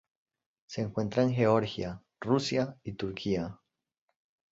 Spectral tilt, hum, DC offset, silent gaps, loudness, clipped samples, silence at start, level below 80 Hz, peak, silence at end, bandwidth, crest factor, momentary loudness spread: -6.5 dB/octave; none; under 0.1%; none; -31 LUFS; under 0.1%; 0.7 s; -60 dBFS; -12 dBFS; 0.95 s; 8 kHz; 20 dB; 13 LU